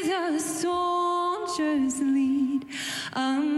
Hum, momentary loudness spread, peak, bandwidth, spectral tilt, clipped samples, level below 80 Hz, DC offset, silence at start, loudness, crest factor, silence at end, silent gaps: none; 6 LU; -18 dBFS; 13 kHz; -3 dB/octave; under 0.1%; -66 dBFS; under 0.1%; 0 s; -26 LUFS; 8 dB; 0 s; none